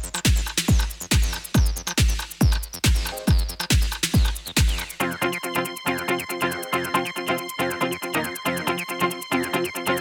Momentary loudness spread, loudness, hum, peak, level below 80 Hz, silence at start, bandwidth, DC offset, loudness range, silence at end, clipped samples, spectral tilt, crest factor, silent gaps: 4 LU; -24 LUFS; none; -6 dBFS; -26 dBFS; 0 s; 18.5 kHz; under 0.1%; 3 LU; 0 s; under 0.1%; -4 dB/octave; 16 dB; none